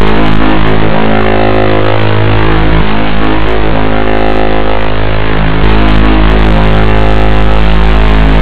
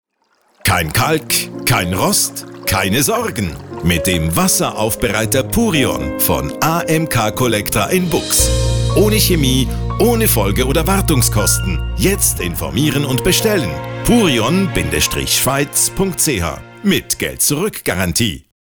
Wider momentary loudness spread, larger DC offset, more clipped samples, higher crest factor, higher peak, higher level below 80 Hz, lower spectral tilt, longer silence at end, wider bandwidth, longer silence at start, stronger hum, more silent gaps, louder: second, 3 LU vs 6 LU; first, 50% vs 0.2%; neither; about the same, 10 dB vs 14 dB; about the same, 0 dBFS vs 0 dBFS; first, -12 dBFS vs -28 dBFS; first, -10.5 dB/octave vs -4 dB/octave; second, 0 s vs 0.25 s; second, 4 kHz vs over 20 kHz; second, 0 s vs 0.65 s; neither; neither; first, -9 LUFS vs -15 LUFS